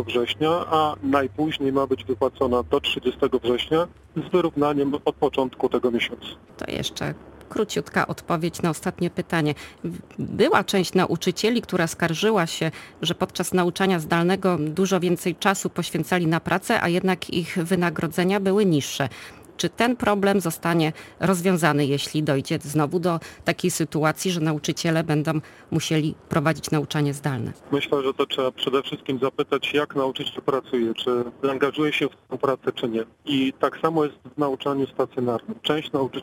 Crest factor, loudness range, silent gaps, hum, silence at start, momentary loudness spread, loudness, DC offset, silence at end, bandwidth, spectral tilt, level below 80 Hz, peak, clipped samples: 20 dB; 3 LU; none; none; 0 s; 7 LU; -24 LUFS; under 0.1%; 0 s; 17 kHz; -5 dB/octave; -54 dBFS; -2 dBFS; under 0.1%